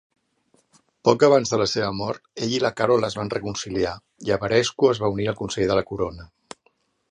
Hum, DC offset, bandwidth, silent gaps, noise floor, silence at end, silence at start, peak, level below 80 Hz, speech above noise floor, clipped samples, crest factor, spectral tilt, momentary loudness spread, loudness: none; under 0.1%; 10.5 kHz; none; -66 dBFS; 0.85 s; 1.05 s; -2 dBFS; -50 dBFS; 44 dB; under 0.1%; 20 dB; -5 dB/octave; 11 LU; -22 LUFS